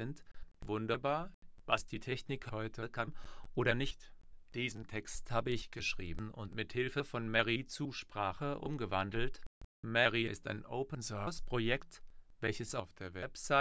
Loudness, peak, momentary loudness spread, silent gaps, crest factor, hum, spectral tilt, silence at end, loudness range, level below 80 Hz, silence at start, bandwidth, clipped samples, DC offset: -38 LUFS; -14 dBFS; 12 LU; 1.34-1.42 s, 9.46-9.83 s; 24 dB; none; -5 dB/octave; 0 s; 3 LU; -54 dBFS; 0 s; 8 kHz; under 0.1%; under 0.1%